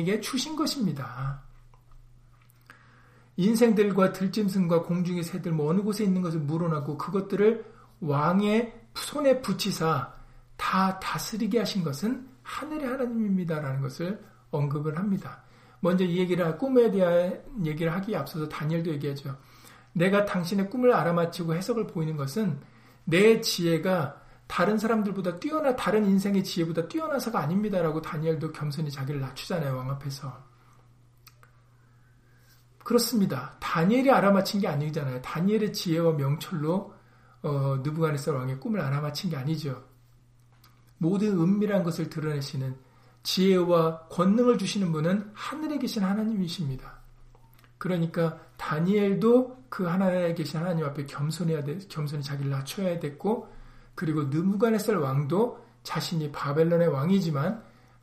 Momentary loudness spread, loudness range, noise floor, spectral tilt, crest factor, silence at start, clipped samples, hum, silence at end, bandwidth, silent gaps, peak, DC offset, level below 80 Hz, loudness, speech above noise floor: 11 LU; 5 LU; -58 dBFS; -6.5 dB/octave; 20 dB; 0 s; under 0.1%; none; 0.4 s; 15.5 kHz; none; -8 dBFS; under 0.1%; -58 dBFS; -27 LUFS; 32 dB